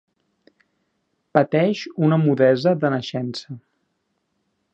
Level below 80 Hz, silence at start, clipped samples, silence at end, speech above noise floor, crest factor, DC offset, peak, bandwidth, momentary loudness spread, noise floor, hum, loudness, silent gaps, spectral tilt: -68 dBFS; 1.35 s; under 0.1%; 1.15 s; 53 dB; 22 dB; under 0.1%; 0 dBFS; 8 kHz; 15 LU; -73 dBFS; none; -20 LUFS; none; -7.5 dB/octave